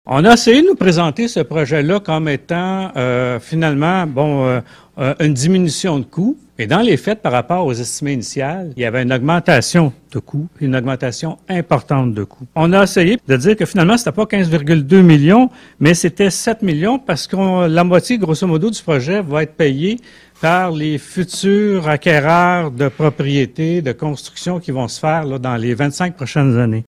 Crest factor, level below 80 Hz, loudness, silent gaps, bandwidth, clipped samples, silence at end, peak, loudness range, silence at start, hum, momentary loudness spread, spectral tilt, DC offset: 14 dB; -46 dBFS; -15 LUFS; none; 14 kHz; 0.2%; 0.05 s; 0 dBFS; 5 LU; 0.05 s; none; 10 LU; -6 dB/octave; under 0.1%